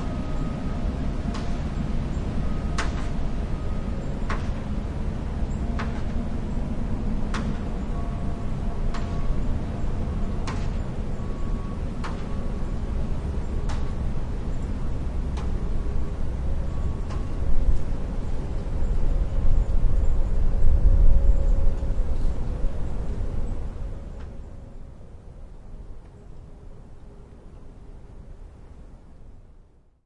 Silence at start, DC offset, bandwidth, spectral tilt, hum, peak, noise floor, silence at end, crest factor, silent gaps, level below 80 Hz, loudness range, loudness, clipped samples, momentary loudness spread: 0 s; under 0.1%; 7.8 kHz; -7.5 dB/octave; none; -6 dBFS; -52 dBFS; 0.65 s; 18 dB; none; -26 dBFS; 19 LU; -30 LUFS; under 0.1%; 20 LU